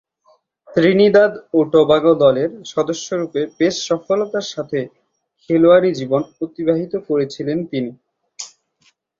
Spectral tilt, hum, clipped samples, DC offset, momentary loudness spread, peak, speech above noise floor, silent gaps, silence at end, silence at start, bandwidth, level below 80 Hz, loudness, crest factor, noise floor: -5.5 dB/octave; none; under 0.1%; under 0.1%; 13 LU; -2 dBFS; 44 dB; none; 0.75 s; 0.7 s; 7.8 kHz; -58 dBFS; -17 LUFS; 16 dB; -61 dBFS